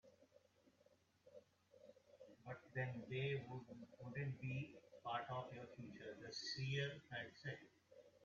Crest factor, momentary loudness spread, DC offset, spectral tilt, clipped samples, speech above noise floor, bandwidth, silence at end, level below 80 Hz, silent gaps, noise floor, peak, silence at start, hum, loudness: 20 dB; 22 LU; under 0.1%; -4 dB/octave; under 0.1%; 28 dB; 7.4 kHz; 0 s; -82 dBFS; none; -76 dBFS; -32 dBFS; 0.05 s; none; -49 LUFS